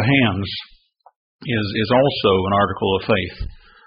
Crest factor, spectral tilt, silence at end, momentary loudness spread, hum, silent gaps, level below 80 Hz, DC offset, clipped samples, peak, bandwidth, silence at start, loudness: 16 dB; -4 dB/octave; 0.35 s; 15 LU; none; 1.16-1.39 s; -42 dBFS; under 0.1%; under 0.1%; -4 dBFS; 5.4 kHz; 0 s; -19 LUFS